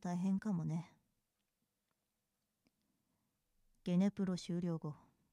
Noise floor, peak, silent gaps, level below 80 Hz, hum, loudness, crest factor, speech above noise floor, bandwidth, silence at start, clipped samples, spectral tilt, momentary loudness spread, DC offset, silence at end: -88 dBFS; -24 dBFS; none; -78 dBFS; none; -39 LUFS; 18 dB; 50 dB; 11 kHz; 0.05 s; under 0.1%; -7.5 dB/octave; 14 LU; under 0.1%; 0.35 s